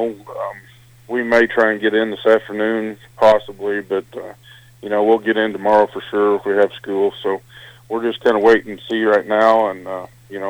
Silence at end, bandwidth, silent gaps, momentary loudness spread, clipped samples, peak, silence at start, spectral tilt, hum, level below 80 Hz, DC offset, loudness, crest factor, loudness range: 0 s; 17 kHz; none; 14 LU; under 0.1%; -2 dBFS; 0 s; -5.5 dB/octave; none; -56 dBFS; under 0.1%; -17 LUFS; 16 dB; 2 LU